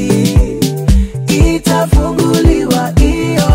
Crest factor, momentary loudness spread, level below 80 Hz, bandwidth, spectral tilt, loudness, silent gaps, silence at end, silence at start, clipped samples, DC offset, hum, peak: 10 dB; 3 LU; -16 dBFS; 16.5 kHz; -6 dB/octave; -12 LUFS; none; 0 s; 0 s; under 0.1%; under 0.1%; none; 0 dBFS